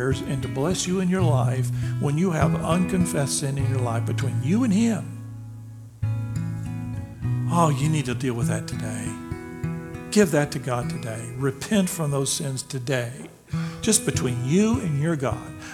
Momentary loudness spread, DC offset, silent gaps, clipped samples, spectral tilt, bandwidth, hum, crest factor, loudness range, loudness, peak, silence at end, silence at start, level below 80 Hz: 11 LU; under 0.1%; none; under 0.1%; -5.5 dB/octave; 16.5 kHz; none; 20 dB; 3 LU; -24 LUFS; -4 dBFS; 0 s; 0 s; -46 dBFS